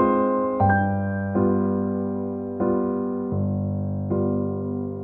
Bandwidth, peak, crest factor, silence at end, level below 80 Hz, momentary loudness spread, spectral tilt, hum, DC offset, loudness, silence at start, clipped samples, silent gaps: 3.4 kHz; -8 dBFS; 16 dB; 0 s; -52 dBFS; 7 LU; -13 dB/octave; none; under 0.1%; -24 LUFS; 0 s; under 0.1%; none